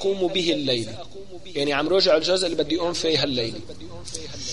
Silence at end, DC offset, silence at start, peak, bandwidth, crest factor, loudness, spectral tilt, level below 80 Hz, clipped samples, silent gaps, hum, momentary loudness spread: 0 s; 1%; 0 s; -8 dBFS; 11.5 kHz; 16 dB; -22 LUFS; -4 dB/octave; -50 dBFS; under 0.1%; none; none; 19 LU